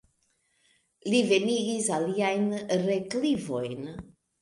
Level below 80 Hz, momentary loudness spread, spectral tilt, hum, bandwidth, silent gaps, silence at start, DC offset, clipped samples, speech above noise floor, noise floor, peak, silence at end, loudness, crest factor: -64 dBFS; 14 LU; -4.5 dB/octave; none; 11.5 kHz; none; 1.05 s; under 0.1%; under 0.1%; 45 dB; -72 dBFS; -10 dBFS; 0.4 s; -27 LUFS; 18 dB